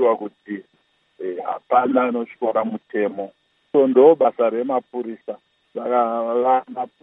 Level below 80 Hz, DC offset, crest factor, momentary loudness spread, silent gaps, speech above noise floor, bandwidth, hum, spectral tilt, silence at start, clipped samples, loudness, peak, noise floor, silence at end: -80 dBFS; under 0.1%; 18 dB; 19 LU; none; 45 dB; 3.9 kHz; none; -9.5 dB/octave; 0 s; under 0.1%; -20 LUFS; -2 dBFS; -64 dBFS; 0.15 s